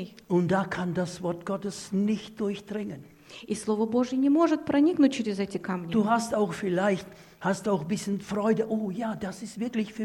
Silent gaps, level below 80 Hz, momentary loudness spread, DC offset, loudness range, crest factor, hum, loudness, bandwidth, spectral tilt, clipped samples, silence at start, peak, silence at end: none; -64 dBFS; 11 LU; under 0.1%; 5 LU; 16 dB; none; -28 LUFS; 17 kHz; -6 dB/octave; under 0.1%; 0 s; -12 dBFS; 0 s